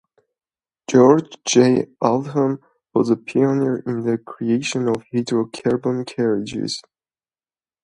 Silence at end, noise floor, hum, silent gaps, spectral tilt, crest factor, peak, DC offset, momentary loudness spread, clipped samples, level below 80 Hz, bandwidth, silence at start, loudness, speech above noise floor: 1.05 s; under -90 dBFS; none; none; -5.5 dB/octave; 20 dB; 0 dBFS; under 0.1%; 10 LU; under 0.1%; -62 dBFS; 10.5 kHz; 0.9 s; -19 LUFS; over 71 dB